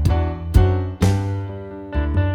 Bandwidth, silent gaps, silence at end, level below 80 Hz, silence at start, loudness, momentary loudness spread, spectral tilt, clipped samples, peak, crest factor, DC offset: 13.5 kHz; none; 0 s; -24 dBFS; 0 s; -20 LUFS; 11 LU; -7.5 dB/octave; under 0.1%; 0 dBFS; 18 dB; under 0.1%